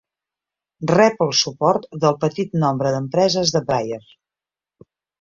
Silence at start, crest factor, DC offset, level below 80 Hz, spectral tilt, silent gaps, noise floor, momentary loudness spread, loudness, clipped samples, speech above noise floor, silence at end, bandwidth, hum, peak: 0.8 s; 18 dB; under 0.1%; -58 dBFS; -4.5 dB/octave; none; -90 dBFS; 7 LU; -19 LUFS; under 0.1%; 71 dB; 1.2 s; 7.6 kHz; none; -2 dBFS